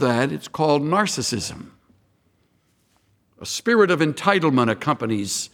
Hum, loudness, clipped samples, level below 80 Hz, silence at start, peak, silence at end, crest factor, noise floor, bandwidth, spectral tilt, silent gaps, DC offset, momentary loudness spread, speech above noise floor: none; -21 LUFS; under 0.1%; -60 dBFS; 0 s; -2 dBFS; 0.05 s; 20 dB; -64 dBFS; 18 kHz; -4.5 dB/octave; none; under 0.1%; 11 LU; 44 dB